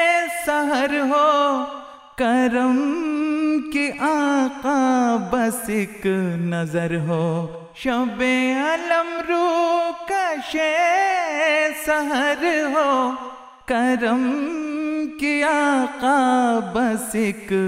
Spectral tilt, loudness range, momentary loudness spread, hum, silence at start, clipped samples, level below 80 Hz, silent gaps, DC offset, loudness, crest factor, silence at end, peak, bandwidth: -5 dB/octave; 2 LU; 7 LU; none; 0 s; under 0.1%; -54 dBFS; none; under 0.1%; -20 LUFS; 16 dB; 0 s; -4 dBFS; 16 kHz